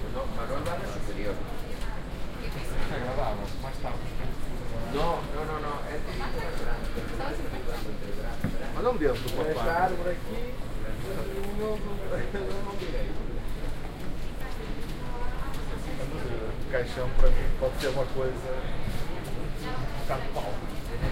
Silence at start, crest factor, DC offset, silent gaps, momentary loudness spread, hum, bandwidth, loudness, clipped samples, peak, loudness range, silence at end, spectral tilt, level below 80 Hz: 0 s; 20 dB; under 0.1%; none; 9 LU; none; 15.5 kHz; -33 LUFS; under 0.1%; -8 dBFS; 5 LU; 0 s; -6 dB/octave; -32 dBFS